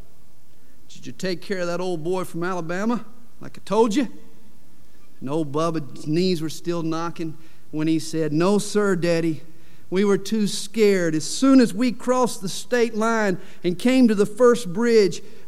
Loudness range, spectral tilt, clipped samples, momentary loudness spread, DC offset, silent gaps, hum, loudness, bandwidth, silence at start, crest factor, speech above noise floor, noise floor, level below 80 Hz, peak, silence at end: 6 LU; -5.5 dB/octave; under 0.1%; 12 LU; 4%; none; none; -22 LUFS; 15 kHz; 0.9 s; 16 dB; 35 dB; -57 dBFS; -62 dBFS; -6 dBFS; 0.25 s